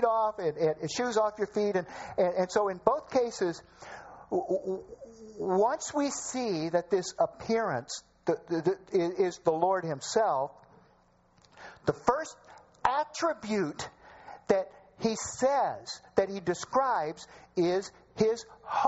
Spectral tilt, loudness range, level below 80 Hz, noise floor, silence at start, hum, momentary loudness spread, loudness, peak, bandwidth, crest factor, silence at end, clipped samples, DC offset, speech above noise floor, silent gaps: -4.5 dB/octave; 3 LU; -64 dBFS; -65 dBFS; 0 s; none; 14 LU; -30 LUFS; -8 dBFS; 8 kHz; 24 dB; 0 s; under 0.1%; under 0.1%; 35 dB; none